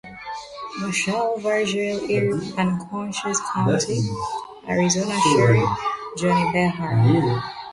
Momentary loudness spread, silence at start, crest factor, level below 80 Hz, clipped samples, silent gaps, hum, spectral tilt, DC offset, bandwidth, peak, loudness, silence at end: 11 LU; 0.05 s; 18 dB; -52 dBFS; under 0.1%; none; none; -5 dB/octave; under 0.1%; 11.5 kHz; -4 dBFS; -21 LUFS; 0 s